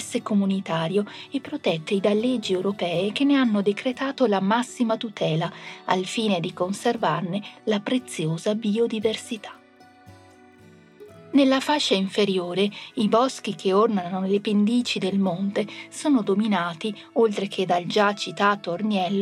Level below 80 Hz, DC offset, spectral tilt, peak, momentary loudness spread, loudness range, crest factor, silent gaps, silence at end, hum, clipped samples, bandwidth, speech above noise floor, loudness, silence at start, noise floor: -76 dBFS; under 0.1%; -5.5 dB/octave; -6 dBFS; 7 LU; 4 LU; 18 dB; none; 0 s; none; under 0.1%; 12.5 kHz; 29 dB; -24 LUFS; 0 s; -52 dBFS